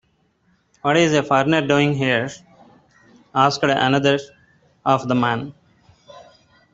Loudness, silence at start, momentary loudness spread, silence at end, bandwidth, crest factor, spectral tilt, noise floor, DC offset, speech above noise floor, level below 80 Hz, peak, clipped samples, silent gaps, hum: -19 LUFS; 0.85 s; 9 LU; 0.5 s; 8 kHz; 18 dB; -5.5 dB/octave; -63 dBFS; under 0.1%; 45 dB; -58 dBFS; -2 dBFS; under 0.1%; none; none